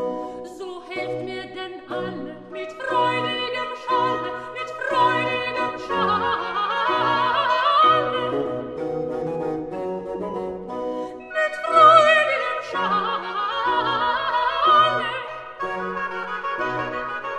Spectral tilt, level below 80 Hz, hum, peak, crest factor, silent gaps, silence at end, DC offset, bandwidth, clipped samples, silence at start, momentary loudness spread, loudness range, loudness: -4.5 dB/octave; -58 dBFS; none; -2 dBFS; 20 dB; none; 0 s; under 0.1%; 10 kHz; under 0.1%; 0 s; 15 LU; 8 LU; -22 LUFS